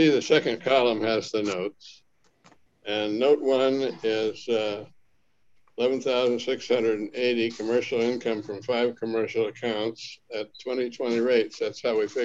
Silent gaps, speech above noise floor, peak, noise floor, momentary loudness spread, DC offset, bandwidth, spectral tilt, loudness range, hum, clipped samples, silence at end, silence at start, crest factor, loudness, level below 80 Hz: none; 44 dB; -8 dBFS; -69 dBFS; 10 LU; 0.1%; 7.8 kHz; -4.5 dB/octave; 2 LU; none; under 0.1%; 0 s; 0 s; 18 dB; -26 LUFS; -72 dBFS